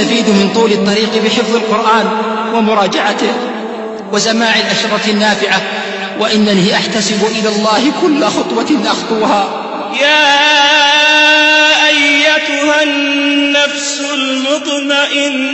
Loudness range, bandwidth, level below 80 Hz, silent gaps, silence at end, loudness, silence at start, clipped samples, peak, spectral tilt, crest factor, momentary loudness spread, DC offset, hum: 5 LU; 8.4 kHz; -56 dBFS; none; 0 s; -10 LUFS; 0 s; under 0.1%; 0 dBFS; -3 dB/octave; 12 dB; 9 LU; under 0.1%; none